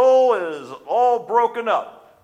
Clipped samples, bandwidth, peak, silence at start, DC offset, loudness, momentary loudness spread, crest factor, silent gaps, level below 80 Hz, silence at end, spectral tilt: under 0.1%; 9.2 kHz; -6 dBFS; 0 s; under 0.1%; -19 LUFS; 14 LU; 14 dB; none; -76 dBFS; 0.3 s; -4 dB/octave